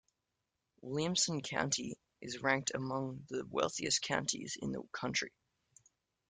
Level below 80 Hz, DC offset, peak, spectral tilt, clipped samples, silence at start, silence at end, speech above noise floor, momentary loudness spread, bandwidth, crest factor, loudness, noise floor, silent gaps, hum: -70 dBFS; under 0.1%; -16 dBFS; -3 dB/octave; under 0.1%; 0.85 s; 1 s; 50 dB; 11 LU; 10.5 kHz; 22 dB; -36 LUFS; -87 dBFS; none; none